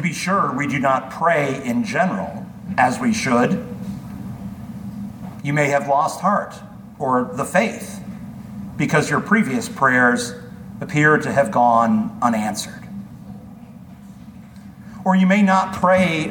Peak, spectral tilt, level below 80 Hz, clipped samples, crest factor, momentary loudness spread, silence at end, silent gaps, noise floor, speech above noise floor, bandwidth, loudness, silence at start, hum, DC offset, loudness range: -2 dBFS; -5.5 dB/octave; -52 dBFS; under 0.1%; 18 dB; 20 LU; 0 s; none; -39 dBFS; 21 dB; 19 kHz; -18 LUFS; 0 s; none; under 0.1%; 5 LU